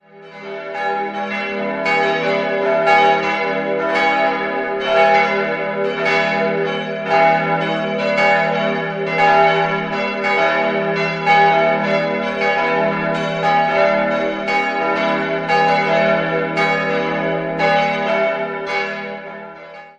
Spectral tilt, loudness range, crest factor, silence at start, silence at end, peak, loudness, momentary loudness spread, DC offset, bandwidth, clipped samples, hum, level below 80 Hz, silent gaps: -5.5 dB/octave; 2 LU; 16 dB; 0.15 s; 0.1 s; -2 dBFS; -17 LUFS; 8 LU; under 0.1%; 9.4 kHz; under 0.1%; none; -56 dBFS; none